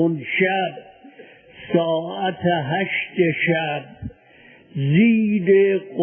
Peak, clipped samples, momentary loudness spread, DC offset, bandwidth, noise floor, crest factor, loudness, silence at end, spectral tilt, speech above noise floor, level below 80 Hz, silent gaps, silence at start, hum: -4 dBFS; under 0.1%; 18 LU; under 0.1%; 3.4 kHz; -49 dBFS; 16 dB; -20 LUFS; 0 s; -11.5 dB/octave; 30 dB; -54 dBFS; none; 0 s; none